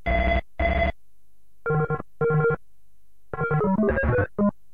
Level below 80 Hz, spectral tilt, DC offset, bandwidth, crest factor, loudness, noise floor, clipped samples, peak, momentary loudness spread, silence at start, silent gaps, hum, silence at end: -34 dBFS; -9.5 dB/octave; 1%; 5 kHz; 14 dB; -24 LUFS; -67 dBFS; under 0.1%; -10 dBFS; 8 LU; 0.05 s; none; none; 0.25 s